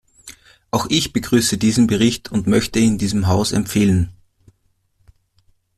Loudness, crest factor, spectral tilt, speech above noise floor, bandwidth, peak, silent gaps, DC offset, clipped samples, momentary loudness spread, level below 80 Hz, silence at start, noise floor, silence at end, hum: -17 LUFS; 16 dB; -5 dB/octave; 47 dB; 14.5 kHz; -2 dBFS; none; under 0.1%; under 0.1%; 5 LU; -42 dBFS; 0.25 s; -64 dBFS; 1.65 s; none